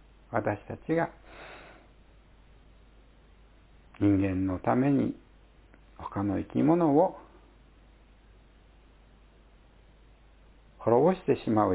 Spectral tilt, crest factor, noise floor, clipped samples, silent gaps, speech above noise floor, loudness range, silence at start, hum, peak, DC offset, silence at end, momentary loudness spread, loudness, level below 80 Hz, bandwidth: -8 dB/octave; 22 dB; -57 dBFS; under 0.1%; none; 31 dB; 10 LU; 0.3 s; none; -8 dBFS; under 0.1%; 0 s; 22 LU; -28 LUFS; -54 dBFS; 4 kHz